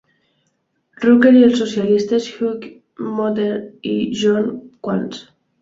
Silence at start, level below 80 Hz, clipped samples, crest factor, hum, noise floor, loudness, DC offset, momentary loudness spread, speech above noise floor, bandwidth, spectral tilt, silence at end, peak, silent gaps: 1 s; -60 dBFS; under 0.1%; 16 dB; none; -68 dBFS; -17 LUFS; under 0.1%; 19 LU; 52 dB; 7.8 kHz; -6 dB/octave; 0.4 s; -2 dBFS; none